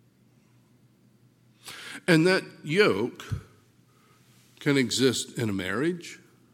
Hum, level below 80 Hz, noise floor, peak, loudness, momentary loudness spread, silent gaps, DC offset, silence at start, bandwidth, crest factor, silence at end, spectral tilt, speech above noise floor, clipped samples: none; -58 dBFS; -61 dBFS; -6 dBFS; -26 LUFS; 18 LU; none; under 0.1%; 1.65 s; 17 kHz; 22 dB; 0.4 s; -4.5 dB/octave; 36 dB; under 0.1%